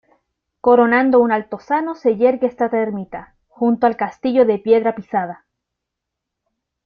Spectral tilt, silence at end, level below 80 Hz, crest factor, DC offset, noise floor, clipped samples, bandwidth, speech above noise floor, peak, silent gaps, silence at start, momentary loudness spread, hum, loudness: -8 dB/octave; 1.5 s; -60 dBFS; 16 dB; under 0.1%; -81 dBFS; under 0.1%; 6.2 kHz; 65 dB; -2 dBFS; none; 0.65 s; 10 LU; none; -17 LUFS